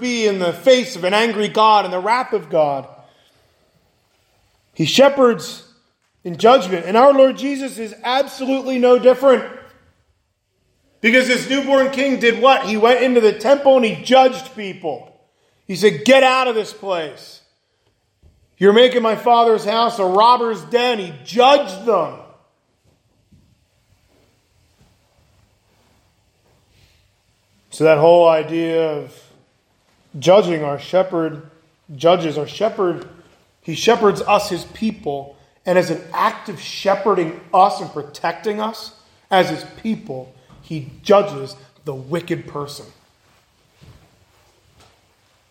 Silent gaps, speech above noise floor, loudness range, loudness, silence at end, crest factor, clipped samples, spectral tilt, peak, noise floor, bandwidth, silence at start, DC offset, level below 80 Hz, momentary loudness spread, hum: none; 51 dB; 8 LU; -16 LUFS; 2.65 s; 18 dB; under 0.1%; -4.5 dB/octave; 0 dBFS; -67 dBFS; 16.5 kHz; 0 s; under 0.1%; -62 dBFS; 17 LU; none